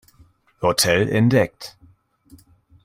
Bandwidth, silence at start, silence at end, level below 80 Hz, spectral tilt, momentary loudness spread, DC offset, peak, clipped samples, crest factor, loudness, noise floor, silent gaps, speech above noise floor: 16.5 kHz; 0.6 s; 1.15 s; -52 dBFS; -4.5 dB/octave; 18 LU; under 0.1%; -4 dBFS; under 0.1%; 18 dB; -19 LUFS; -55 dBFS; none; 37 dB